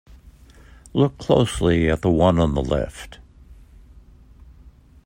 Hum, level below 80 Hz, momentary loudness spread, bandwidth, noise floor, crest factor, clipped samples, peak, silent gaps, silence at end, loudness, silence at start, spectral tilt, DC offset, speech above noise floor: none; -36 dBFS; 13 LU; 16 kHz; -48 dBFS; 20 dB; under 0.1%; -2 dBFS; none; 1.55 s; -20 LUFS; 0.95 s; -7 dB/octave; under 0.1%; 29 dB